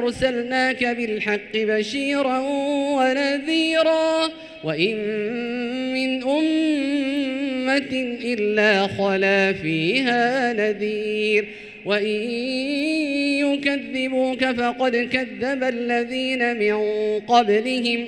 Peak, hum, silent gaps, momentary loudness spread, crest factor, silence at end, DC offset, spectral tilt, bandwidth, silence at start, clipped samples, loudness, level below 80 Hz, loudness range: -4 dBFS; none; none; 6 LU; 18 dB; 0 s; under 0.1%; -4.5 dB/octave; 11.5 kHz; 0 s; under 0.1%; -21 LUFS; -58 dBFS; 2 LU